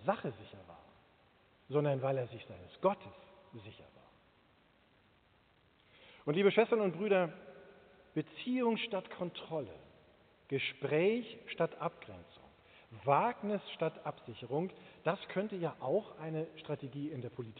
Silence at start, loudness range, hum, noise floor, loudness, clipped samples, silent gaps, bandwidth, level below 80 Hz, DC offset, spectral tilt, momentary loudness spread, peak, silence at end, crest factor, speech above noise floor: 0 s; 6 LU; none; -69 dBFS; -36 LUFS; under 0.1%; none; 4.6 kHz; -76 dBFS; under 0.1%; -5 dB/octave; 22 LU; -16 dBFS; 0 s; 22 dB; 33 dB